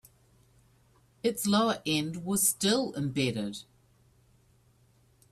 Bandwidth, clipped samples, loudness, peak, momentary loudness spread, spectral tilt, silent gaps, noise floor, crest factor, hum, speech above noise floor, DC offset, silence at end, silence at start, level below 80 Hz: 15 kHz; under 0.1%; -29 LUFS; -12 dBFS; 9 LU; -3.5 dB/octave; none; -65 dBFS; 20 dB; none; 36 dB; under 0.1%; 1.7 s; 1.25 s; -66 dBFS